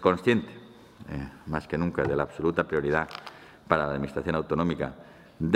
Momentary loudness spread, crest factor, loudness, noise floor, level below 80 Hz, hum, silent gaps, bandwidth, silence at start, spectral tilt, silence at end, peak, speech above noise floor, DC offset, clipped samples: 18 LU; 24 dB; -28 LUFS; -48 dBFS; -52 dBFS; none; none; 13 kHz; 0 s; -7.5 dB/octave; 0 s; -4 dBFS; 21 dB; under 0.1%; under 0.1%